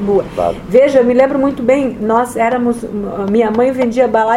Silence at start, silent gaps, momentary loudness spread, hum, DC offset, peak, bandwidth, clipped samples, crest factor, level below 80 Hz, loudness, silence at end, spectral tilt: 0 s; none; 8 LU; none; under 0.1%; 0 dBFS; 13 kHz; under 0.1%; 12 dB; -40 dBFS; -13 LUFS; 0 s; -6.5 dB/octave